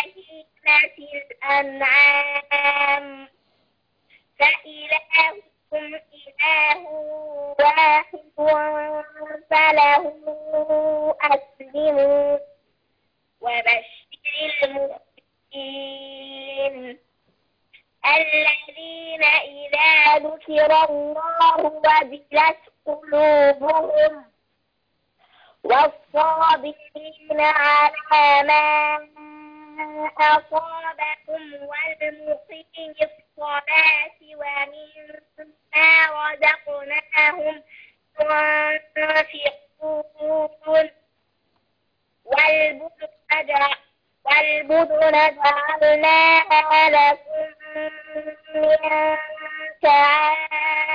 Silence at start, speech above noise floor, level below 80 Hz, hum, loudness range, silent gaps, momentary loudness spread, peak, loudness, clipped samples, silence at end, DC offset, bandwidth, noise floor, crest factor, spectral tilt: 0 s; 52 dB; -64 dBFS; none; 7 LU; none; 18 LU; -6 dBFS; -18 LUFS; under 0.1%; 0 s; under 0.1%; 5.2 kHz; -71 dBFS; 16 dB; -3.5 dB/octave